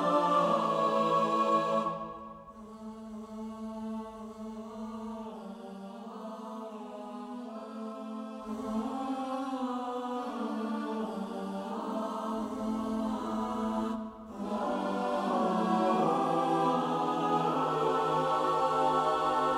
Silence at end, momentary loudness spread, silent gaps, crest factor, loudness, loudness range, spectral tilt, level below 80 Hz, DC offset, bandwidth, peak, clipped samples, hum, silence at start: 0 s; 15 LU; none; 18 dB; -32 LUFS; 13 LU; -6 dB/octave; -64 dBFS; under 0.1%; 14 kHz; -14 dBFS; under 0.1%; none; 0 s